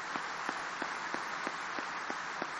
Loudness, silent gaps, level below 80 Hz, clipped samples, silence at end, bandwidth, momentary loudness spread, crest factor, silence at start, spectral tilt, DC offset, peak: -38 LUFS; none; -76 dBFS; under 0.1%; 0 s; 11 kHz; 1 LU; 20 dB; 0 s; -2 dB/octave; under 0.1%; -20 dBFS